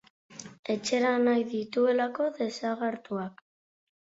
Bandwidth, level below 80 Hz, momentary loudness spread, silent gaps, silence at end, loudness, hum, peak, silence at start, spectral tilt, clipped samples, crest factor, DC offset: 8 kHz; -76 dBFS; 16 LU; 0.59-0.63 s; 0.85 s; -29 LUFS; none; -14 dBFS; 0.3 s; -4.5 dB/octave; under 0.1%; 16 dB; under 0.1%